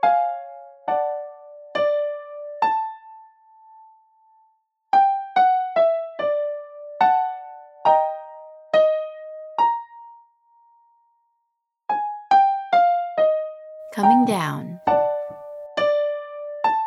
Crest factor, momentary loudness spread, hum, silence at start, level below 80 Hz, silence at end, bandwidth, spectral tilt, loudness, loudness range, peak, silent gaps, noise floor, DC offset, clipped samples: 18 dB; 18 LU; none; 0 s; -70 dBFS; 0 s; 12.5 kHz; -6 dB/octave; -21 LUFS; 7 LU; -4 dBFS; none; -77 dBFS; under 0.1%; under 0.1%